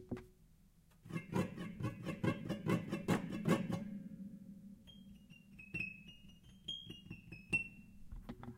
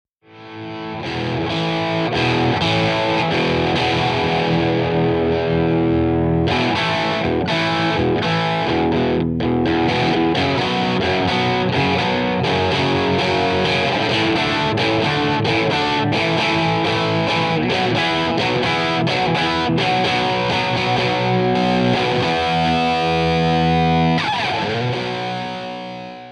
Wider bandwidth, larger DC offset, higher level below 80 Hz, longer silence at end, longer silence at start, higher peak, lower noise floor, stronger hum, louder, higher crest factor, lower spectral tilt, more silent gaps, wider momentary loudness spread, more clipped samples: first, 16 kHz vs 10.5 kHz; neither; second, -62 dBFS vs -44 dBFS; about the same, 0 s vs 0 s; second, 0 s vs 0.3 s; second, -20 dBFS vs -6 dBFS; first, -67 dBFS vs -40 dBFS; neither; second, -42 LUFS vs -18 LUFS; first, 22 dB vs 12 dB; about the same, -6 dB/octave vs -6 dB/octave; neither; first, 20 LU vs 4 LU; neither